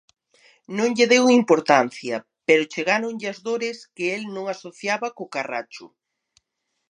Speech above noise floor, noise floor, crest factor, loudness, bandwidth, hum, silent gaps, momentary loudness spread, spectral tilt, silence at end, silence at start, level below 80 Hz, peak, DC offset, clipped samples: 56 dB; -78 dBFS; 22 dB; -22 LUFS; 10 kHz; none; none; 14 LU; -3.5 dB/octave; 1.05 s; 0.7 s; -76 dBFS; 0 dBFS; under 0.1%; under 0.1%